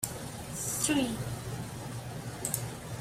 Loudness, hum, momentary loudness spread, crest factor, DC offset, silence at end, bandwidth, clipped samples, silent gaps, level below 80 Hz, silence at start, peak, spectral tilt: -34 LUFS; none; 12 LU; 22 dB; under 0.1%; 0 s; 16 kHz; under 0.1%; none; -54 dBFS; 0 s; -12 dBFS; -3.5 dB/octave